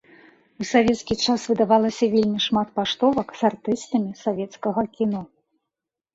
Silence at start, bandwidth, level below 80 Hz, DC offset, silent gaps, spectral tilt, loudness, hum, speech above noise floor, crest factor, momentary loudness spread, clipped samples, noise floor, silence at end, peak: 0.6 s; 8 kHz; -56 dBFS; under 0.1%; none; -5 dB/octave; -22 LUFS; none; 64 dB; 18 dB; 8 LU; under 0.1%; -86 dBFS; 0.9 s; -4 dBFS